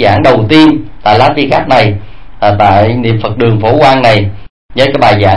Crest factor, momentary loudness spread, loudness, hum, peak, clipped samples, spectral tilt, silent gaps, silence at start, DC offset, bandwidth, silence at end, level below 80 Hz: 8 dB; 7 LU; -8 LUFS; none; 0 dBFS; 3%; -7 dB/octave; 4.50-4.69 s; 0 s; 7%; 11 kHz; 0 s; -32 dBFS